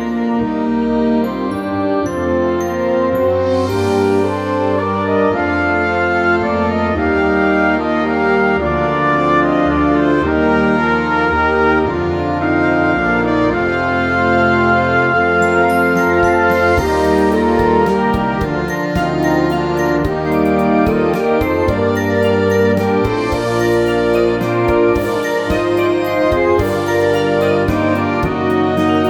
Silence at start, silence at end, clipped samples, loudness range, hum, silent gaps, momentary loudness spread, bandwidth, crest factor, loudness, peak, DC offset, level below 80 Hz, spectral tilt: 0 s; 0 s; under 0.1%; 2 LU; none; none; 4 LU; 18 kHz; 14 dB; -15 LUFS; 0 dBFS; under 0.1%; -34 dBFS; -7 dB/octave